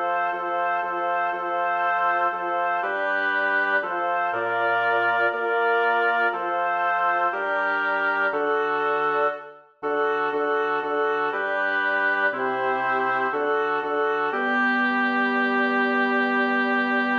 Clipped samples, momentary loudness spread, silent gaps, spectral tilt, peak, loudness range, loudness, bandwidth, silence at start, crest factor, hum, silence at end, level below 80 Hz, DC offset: under 0.1%; 4 LU; none; -5.5 dB/octave; -10 dBFS; 2 LU; -23 LUFS; 7 kHz; 0 s; 14 dB; none; 0 s; -72 dBFS; under 0.1%